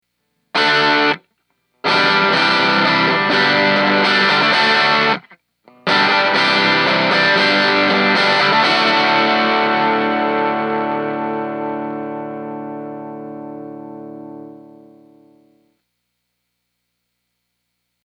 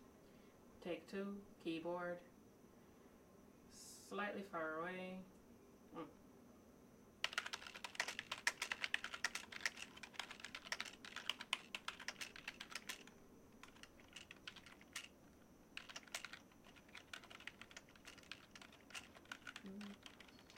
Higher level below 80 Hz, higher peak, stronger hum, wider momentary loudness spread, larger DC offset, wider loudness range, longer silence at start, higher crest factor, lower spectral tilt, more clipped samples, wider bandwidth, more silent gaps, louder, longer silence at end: about the same, -74 dBFS vs -78 dBFS; first, 0 dBFS vs -20 dBFS; first, 60 Hz at -60 dBFS vs none; second, 18 LU vs 21 LU; neither; first, 17 LU vs 10 LU; first, 0.55 s vs 0 s; second, 18 dB vs 32 dB; first, -4 dB/octave vs -2 dB/octave; neither; second, 10.5 kHz vs 16.5 kHz; neither; first, -14 LUFS vs -49 LUFS; first, 3.5 s vs 0 s